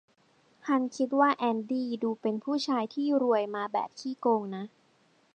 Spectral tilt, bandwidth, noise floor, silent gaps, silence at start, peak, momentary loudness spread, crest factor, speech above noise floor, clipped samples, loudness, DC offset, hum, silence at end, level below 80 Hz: -5.5 dB/octave; 9 kHz; -66 dBFS; none; 0.65 s; -12 dBFS; 10 LU; 18 dB; 37 dB; under 0.1%; -29 LUFS; under 0.1%; none; 0.7 s; -86 dBFS